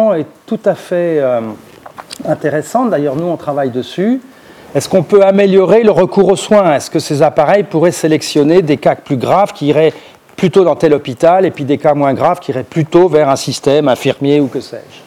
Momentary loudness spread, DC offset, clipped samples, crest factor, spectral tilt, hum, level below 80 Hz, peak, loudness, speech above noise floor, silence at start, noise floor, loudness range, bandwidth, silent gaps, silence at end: 9 LU; under 0.1%; under 0.1%; 12 dB; -6 dB/octave; none; -52 dBFS; 0 dBFS; -12 LUFS; 21 dB; 0 s; -32 dBFS; 6 LU; 15.5 kHz; none; 0.1 s